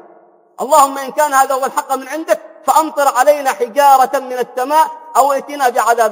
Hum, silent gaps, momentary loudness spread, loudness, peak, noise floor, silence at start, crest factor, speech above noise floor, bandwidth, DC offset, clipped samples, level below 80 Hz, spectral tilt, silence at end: none; none; 8 LU; -14 LUFS; 0 dBFS; -46 dBFS; 0.6 s; 14 dB; 33 dB; 18.5 kHz; under 0.1%; 0.1%; -66 dBFS; -1.5 dB/octave; 0 s